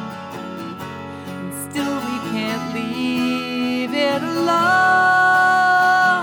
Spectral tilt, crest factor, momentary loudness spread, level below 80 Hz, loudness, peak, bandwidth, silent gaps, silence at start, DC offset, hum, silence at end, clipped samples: -4 dB/octave; 14 dB; 17 LU; -66 dBFS; -17 LUFS; -6 dBFS; 20 kHz; none; 0 s; under 0.1%; none; 0 s; under 0.1%